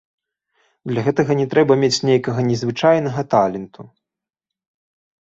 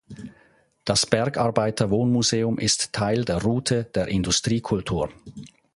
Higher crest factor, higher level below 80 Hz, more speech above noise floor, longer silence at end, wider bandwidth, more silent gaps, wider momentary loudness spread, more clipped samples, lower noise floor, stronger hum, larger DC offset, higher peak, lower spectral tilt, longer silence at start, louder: second, 18 dB vs 24 dB; second, -58 dBFS vs -46 dBFS; first, 69 dB vs 36 dB; first, 1.4 s vs 0.3 s; second, 8 kHz vs 11.5 kHz; neither; second, 10 LU vs 20 LU; neither; first, -86 dBFS vs -59 dBFS; neither; neither; about the same, -2 dBFS vs 0 dBFS; first, -6 dB/octave vs -4.5 dB/octave; first, 0.85 s vs 0.1 s; first, -18 LUFS vs -23 LUFS